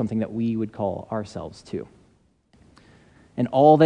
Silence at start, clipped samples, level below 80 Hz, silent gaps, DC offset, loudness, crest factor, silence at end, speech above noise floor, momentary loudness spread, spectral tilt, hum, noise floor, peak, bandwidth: 0 s; under 0.1%; -60 dBFS; none; under 0.1%; -25 LUFS; 22 dB; 0 s; 40 dB; 17 LU; -8.5 dB/octave; none; -61 dBFS; -2 dBFS; 9.8 kHz